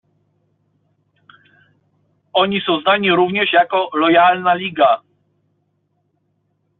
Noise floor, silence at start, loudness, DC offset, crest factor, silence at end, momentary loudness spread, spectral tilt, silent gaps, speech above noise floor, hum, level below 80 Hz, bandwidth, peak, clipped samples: -66 dBFS; 2.35 s; -15 LUFS; under 0.1%; 16 dB; 1.8 s; 6 LU; -2 dB/octave; none; 52 dB; none; -62 dBFS; 4.2 kHz; -2 dBFS; under 0.1%